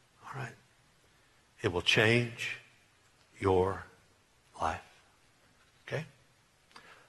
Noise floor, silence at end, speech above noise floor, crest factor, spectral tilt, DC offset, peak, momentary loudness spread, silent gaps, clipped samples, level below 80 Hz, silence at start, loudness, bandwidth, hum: -67 dBFS; 0.15 s; 37 dB; 24 dB; -4.5 dB/octave; under 0.1%; -10 dBFS; 20 LU; none; under 0.1%; -62 dBFS; 0.25 s; -32 LUFS; 12 kHz; none